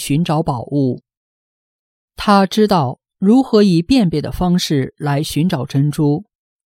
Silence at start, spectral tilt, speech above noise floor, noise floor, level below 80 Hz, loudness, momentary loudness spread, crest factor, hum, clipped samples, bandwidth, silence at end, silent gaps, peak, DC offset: 0 s; -6.5 dB/octave; over 75 dB; under -90 dBFS; -42 dBFS; -16 LUFS; 7 LU; 14 dB; none; under 0.1%; 16.5 kHz; 0.45 s; 1.17-2.08 s; -2 dBFS; under 0.1%